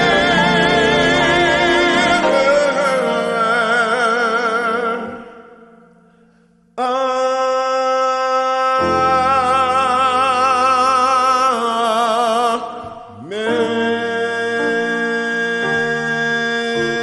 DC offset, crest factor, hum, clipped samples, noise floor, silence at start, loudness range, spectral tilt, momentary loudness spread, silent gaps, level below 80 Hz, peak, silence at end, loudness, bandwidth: under 0.1%; 14 dB; none; under 0.1%; -53 dBFS; 0 s; 6 LU; -4 dB/octave; 7 LU; none; -46 dBFS; -4 dBFS; 0 s; -15 LUFS; 12 kHz